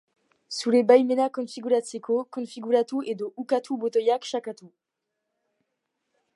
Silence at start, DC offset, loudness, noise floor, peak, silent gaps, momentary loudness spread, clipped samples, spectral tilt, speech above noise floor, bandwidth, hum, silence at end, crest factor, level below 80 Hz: 0.5 s; under 0.1%; -25 LUFS; -82 dBFS; -4 dBFS; none; 15 LU; under 0.1%; -4.5 dB/octave; 58 dB; 11.5 kHz; none; 1.7 s; 22 dB; -84 dBFS